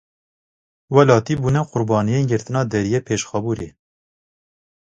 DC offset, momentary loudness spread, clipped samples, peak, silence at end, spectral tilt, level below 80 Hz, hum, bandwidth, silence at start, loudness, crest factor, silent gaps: under 0.1%; 9 LU; under 0.1%; 0 dBFS; 1.25 s; -6.5 dB/octave; -50 dBFS; none; 9 kHz; 0.9 s; -19 LUFS; 20 dB; none